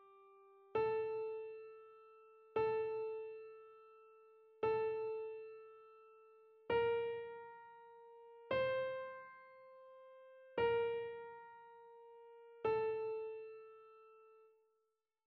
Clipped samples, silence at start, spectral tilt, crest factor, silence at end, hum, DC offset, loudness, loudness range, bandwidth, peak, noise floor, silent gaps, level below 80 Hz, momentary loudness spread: under 0.1%; 0 s; -3 dB/octave; 18 dB; 0.9 s; none; under 0.1%; -41 LUFS; 3 LU; 5.2 kHz; -26 dBFS; -87 dBFS; none; -78 dBFS; 23 LU